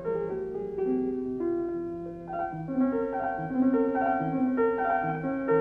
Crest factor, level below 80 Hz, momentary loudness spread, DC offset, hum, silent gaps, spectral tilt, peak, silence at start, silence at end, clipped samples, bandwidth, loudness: 14 dB; -58 dBFS; 8 LU; under 0.1%; none; none; -10 dB/octave; -14 dBFS; 0 s; 0 s; under 0.1%; 3.5 kHz; -29 LUFS